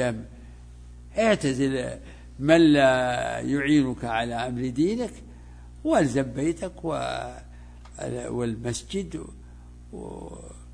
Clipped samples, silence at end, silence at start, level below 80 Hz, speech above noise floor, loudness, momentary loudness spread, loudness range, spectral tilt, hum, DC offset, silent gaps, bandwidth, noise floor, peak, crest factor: under 0.1%; 0 s; 0 s; -46 dBFS; 20 dB; -25 LUFS; 21 LU; 11 LU; -5.5 dB/octave; 60 Hz at -45 dBFS; under 0.1%; none; 10.5 kHz; -45 dBFS; -6 dBFS; 20 dB